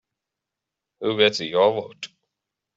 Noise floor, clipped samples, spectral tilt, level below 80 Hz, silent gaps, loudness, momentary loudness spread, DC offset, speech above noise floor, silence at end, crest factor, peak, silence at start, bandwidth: -85 dBFS; under 0.1%; -2 dB/octave; -72 dBFS; none; -21 LUFS; 18 LU; under 0.1%; 64 dB; 0.7 s; 22 dB; -4 dBFS; 1 s; 8 kHz